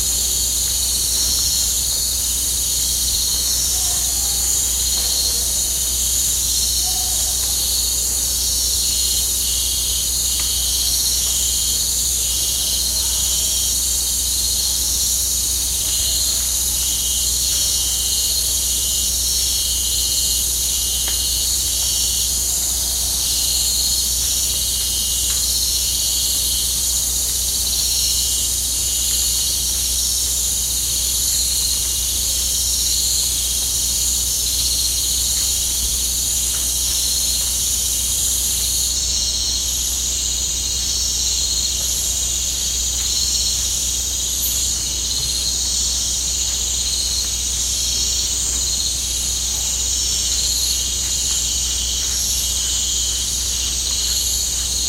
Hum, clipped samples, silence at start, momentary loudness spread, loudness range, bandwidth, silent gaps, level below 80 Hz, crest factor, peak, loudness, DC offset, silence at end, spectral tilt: none; under 0.1%; 0 s; 2 LU; 1 LU; 16 kHz; none; -32 dBFS; 14 dB; -4 dBFS; -16 LUFS; under 0.1%; 0 s; 0 dB/octave